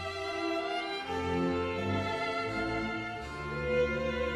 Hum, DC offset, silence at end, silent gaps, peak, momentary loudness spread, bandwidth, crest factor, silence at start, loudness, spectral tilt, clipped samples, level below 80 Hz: none; under 0.1%; 0 s; none; -18 dBFS; 6 LU; 13 kHz; 14 dB; 0 s; -33 LUFS; -6 dB/octave; under 0.1%; -50 dBFS